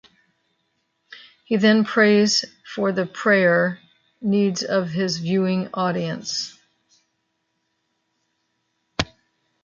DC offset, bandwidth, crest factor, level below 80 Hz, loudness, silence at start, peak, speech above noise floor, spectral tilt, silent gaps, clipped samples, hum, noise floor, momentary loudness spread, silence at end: under 0.1%; 7.6 kHz; 20 dB; -56 dBFS; -21 LUFS; 1.1 s; -2 dBFS; 53 dB; -4.5 dB/octave; none; under 0.1%; none; -73 dBFS; 12 LU; 0.6 s